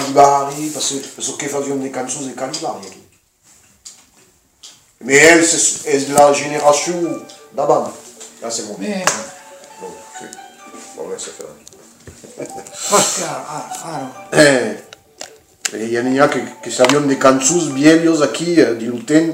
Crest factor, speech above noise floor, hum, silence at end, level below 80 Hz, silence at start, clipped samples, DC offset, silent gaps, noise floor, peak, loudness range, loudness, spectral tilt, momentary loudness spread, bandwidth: 16 dB; 37 dB; none; 0 s; -60 dBFS; 0 s; 0.1%; under 0.1%; none; -52 dBFS; 0 dBFS; 13 LU; -15 LUFS; -3 dB/octave; 22 LU; 16.5 kHz